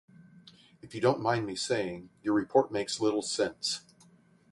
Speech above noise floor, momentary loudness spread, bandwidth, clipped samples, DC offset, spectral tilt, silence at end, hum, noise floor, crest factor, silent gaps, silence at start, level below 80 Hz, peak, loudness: 31 dB; 10 LU; 11.5 kHz; under 0.1%; under 0.1%; -4 dB/octave; 0.7 s; none; -61 dBFS; 22 dB; none; 0.35 s; -68 dBFS; -10 dBFS; -30 LUFS